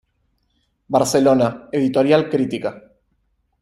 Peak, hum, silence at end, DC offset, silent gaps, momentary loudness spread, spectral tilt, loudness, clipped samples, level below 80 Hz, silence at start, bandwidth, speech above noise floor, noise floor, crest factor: -2 dBFS; none; 0.8 s; under 0.1%; none; 8 LU; -5.5 dB/octave; -18 LUFS; under 0.1%; -56 dBFS; 0.9 s; 15 kHz; 50 dB; -67 dBFS; 18 dB